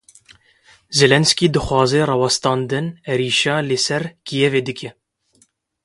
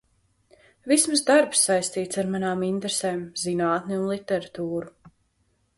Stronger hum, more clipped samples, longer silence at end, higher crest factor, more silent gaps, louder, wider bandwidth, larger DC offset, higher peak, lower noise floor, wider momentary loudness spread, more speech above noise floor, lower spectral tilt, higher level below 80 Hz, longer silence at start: neither; neither; first, 0.95 s vs 0.7 s; about the same, 20 dB vs 20 dB; neither; first, -17 LUFS vs -24 LUFS; about the same, 11.5 kHz vs 12 kHz; neither; first, 0 dBFS vs -6 dBFS; second, -59 dBFS vs -69 dBFS; about the same, 10 LU vs 12 LU; about the same, 42 dB vs 45 dB; about the same, -4 dB/octave vs -3.5 dB/octave; first, -46 dBFS vs -64 dBFS; about the same, 0.9 s vs 0.85 s